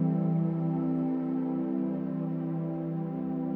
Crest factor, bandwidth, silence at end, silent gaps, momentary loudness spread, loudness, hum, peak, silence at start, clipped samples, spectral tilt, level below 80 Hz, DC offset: 12 dB; 3.1 kHz; 0 s; none; 5 LU; -31 LUFS; none; -18 dBFS; 0 s; under 0.1%; -12.5 dB/octave; -78 dBFS; under 0.1%